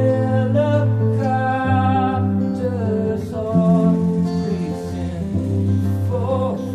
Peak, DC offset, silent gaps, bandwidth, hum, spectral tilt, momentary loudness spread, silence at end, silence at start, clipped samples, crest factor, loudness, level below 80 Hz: -4 dBFS; under 0.1%; none; 10 kHz; none; -9 dB/octave; 7 LU; 0 s; 0 s; under 0.1%; 14 dB; -19 LUFS; -46 dBFS